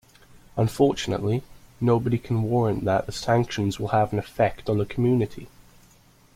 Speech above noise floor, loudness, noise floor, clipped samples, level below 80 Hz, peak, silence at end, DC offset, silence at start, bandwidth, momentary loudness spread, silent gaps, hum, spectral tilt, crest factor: 33 dB; -24 LUFS; -56 dBFS; under 0.1%; -50 dBFS; -8 dBFS; 0.85 s; under 0.1%; 0.55 s; 15.5 kHz; 6 LU; none; none; -7 dB/octave; 18 dB